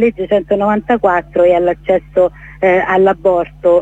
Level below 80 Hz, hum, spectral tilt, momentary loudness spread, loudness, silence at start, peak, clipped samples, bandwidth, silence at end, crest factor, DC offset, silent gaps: -40 dBFS; none; -8 dB/octave; 4 LU; -13 LUFS; 0 s; -2 dBFS; under 0.1%; 7.8 kHz; 0 s; 12 dB; under 0.1%; none